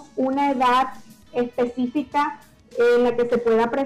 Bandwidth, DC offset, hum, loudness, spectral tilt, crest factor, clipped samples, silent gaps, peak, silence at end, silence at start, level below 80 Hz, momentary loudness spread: 12 kHz; under 0.1%; none; -21 LUFS; -5.5 dB/octave; 8 dB; under 0.1%; none; -14 dBFS; 0 s; 0 s; -56 dBFS; 10 LU